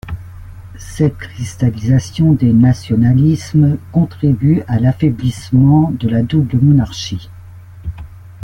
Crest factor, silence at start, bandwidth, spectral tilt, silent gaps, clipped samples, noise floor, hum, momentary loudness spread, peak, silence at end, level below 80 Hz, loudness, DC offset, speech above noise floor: 12 dB; 0.05 s; 11.5 kHz; -8 dB/octave; none; under 0.1%; -34 dBFS; none; 18 LU; -2 dBFS; 0.15 s; -36 dBFS; -14 LUFS; under 0.1%; 22 dB